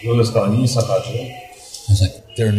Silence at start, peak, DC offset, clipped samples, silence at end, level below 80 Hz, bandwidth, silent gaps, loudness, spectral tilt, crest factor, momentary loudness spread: 0 s; -4 dBFS; under 0.1%; under 0.1%; 0 s; -42 dBFS; 14.5 kHz; none; -18 LUFS; -6 dB/octave; 14 dB; 16 LU